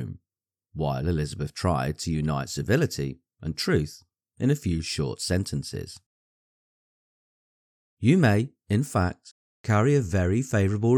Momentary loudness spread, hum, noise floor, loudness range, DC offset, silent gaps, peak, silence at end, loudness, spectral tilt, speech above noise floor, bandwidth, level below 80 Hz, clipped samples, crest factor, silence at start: 14 LU; none; under -90 dBFS; 6 LU; under 0.1%; 6.06-7.97 s, 9.31-9.64 s; -8 dBFS; 0 s; -26 LUFS; -6 dB/octave; over 65 dB; 17.5 kHz; -46 dBFS; under 0.1%; 18 dB; 0 s